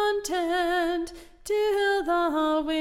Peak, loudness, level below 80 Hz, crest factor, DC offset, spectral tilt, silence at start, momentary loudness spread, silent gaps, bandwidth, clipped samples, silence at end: -16 dBFS; -26 LUFS; -52 dBFS; 10 dB; under 0.1%; -2.5 dB/octave; 0 s; 7 LU; none; 16 kHz; under 0.1%; 0 s